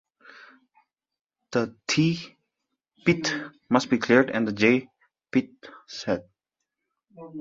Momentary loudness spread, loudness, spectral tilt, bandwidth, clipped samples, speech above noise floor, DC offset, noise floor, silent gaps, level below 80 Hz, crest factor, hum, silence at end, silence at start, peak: 14 LU; -25 LUFS; -5 dB/octave; 7.8 kHz; under 0.1%; over 66 dB; under 0.1%; under -90 dBFS; none; -64 dBFS; 24 dB; none; 0 s; 1.5 s; -4 dBFS